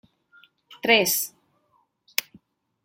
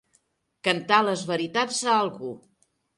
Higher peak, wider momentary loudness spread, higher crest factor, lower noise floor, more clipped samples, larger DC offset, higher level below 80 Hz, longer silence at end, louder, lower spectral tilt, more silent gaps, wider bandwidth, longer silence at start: first, 0 dBFS vs -6 dBFS; second, 11 LU vs 16 LU; first, 28 dB vs 20 dB; about the same, -68 dBFS vs -69 dBFS; neither; neither; about the same, -74 dBFS vs -72 dBFS; first, 1.55 s vs 0.6 s; about the same, -23 LUFS vs -24 LUFS; second, -1 dB/octave vs -3 dB/octave; neither; first, 16.5 kHz vs 11.5 kHz; about the same, 0.7 s vs 0.65 s